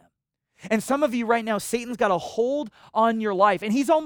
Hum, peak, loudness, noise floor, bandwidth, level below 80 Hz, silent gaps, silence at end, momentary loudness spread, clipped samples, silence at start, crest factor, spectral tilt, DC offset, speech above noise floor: none; -6 dBFS; -24 LUFS; -75 dBFS; over 20 kHz; -64 dBFS; none; 0 s; 6 LU; under 0.1%; 0.65 s; 18 dB; -4.5 dB/octave; under 0.1%; 53 dB